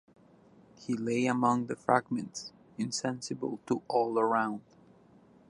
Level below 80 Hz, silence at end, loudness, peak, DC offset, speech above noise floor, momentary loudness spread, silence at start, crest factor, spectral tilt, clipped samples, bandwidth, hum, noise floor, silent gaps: -74 dBFS; 0.9 s; -31 LUFS; -10 dBFS; under 0.1%; 29 dB; 13 LU; 0.8 s; 24 dB; -5 dB/octave; under 0.1%; 11.5 kHz; none; -60 dBFS; none